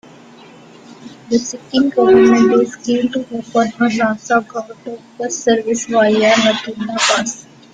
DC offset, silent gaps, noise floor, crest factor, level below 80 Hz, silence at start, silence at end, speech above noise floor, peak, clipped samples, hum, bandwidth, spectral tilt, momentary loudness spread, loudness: under 0.1%; none; -40 dBFS; 14 dB; -56 dBFS; 0.9 s; 0.3 s; 26 dB; -2 dBFS; under 0.1%; none; 9.4 kHz; -3.5 dB/octave; 15 LU; -15 LUFS